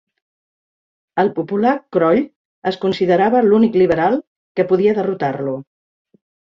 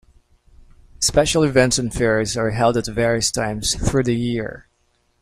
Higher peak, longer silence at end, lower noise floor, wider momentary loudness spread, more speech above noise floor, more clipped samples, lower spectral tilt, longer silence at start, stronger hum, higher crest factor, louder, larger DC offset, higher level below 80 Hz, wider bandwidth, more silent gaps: about the same, -2 dBFS vs -4 dBFS; first, 0.9 s vs 0.6 s; first, under -90 dBFS vs -64 dBFS; first, 12 LU vs 6 LU; first, over 75 dB vs 46 dB; neither; first, -8.5 dB/octave vs -4 dB/octave; first, 1.15 s vs 1 s; neither; about the same, 16 dB vs 18 dB; about the same, -17 LUFS vs -19 LUFS; neither; second, -58 dBFS vs -36 dBFS; second, 7.2 kHz vs 16 kHz; first, 2.36-2.62 s, 4.27-4.55 s vs none